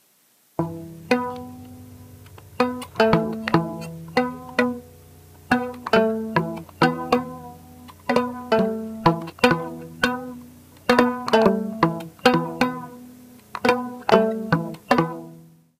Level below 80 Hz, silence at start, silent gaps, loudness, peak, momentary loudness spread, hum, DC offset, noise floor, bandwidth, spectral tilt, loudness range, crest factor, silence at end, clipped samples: -54 dBFS; 0.6 s; none; -22 LUFS; 0 dBFS; 18 LU; none; under 0.1%; -60 dBFS; 15.5 kHz; -6 dB/octave; 3 LU; 24 dB; 0.4 s; under 0.1%